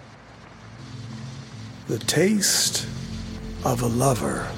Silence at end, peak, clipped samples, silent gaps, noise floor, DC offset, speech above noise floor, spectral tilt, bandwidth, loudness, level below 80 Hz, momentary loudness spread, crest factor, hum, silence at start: 0 s; -6 dBFS; under 0.1%; none; -45 dBFS; under 0.1%; 23 dB; -3.5 dB/octave; 16.5 kHz; -23 LUFS; -44 dBFS; 21 LU; 20 dB; none; 0 s